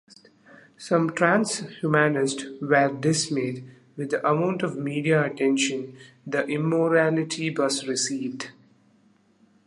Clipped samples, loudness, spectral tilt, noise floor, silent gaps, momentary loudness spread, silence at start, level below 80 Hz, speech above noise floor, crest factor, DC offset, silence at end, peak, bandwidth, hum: under 0.1%; -24 LUFS; -4.5 dB/octave; -61 dBFS; none; 13 LU; 0.8 s; -72 dBFS; 37 dB; 20 dB; under 0.1%; 1.15 s; -4 dBFS; 11.5 kHz; none